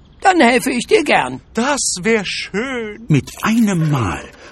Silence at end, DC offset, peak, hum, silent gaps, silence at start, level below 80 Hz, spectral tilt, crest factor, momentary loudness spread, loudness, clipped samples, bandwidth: 0 s; under 0.1%; 0 dBFS; none; none; 0.2 s; -44 dBFS; -4.5 dB/octave; 16 dB; 10 LU; -16 LUFS; under 0.1%; 14 kHz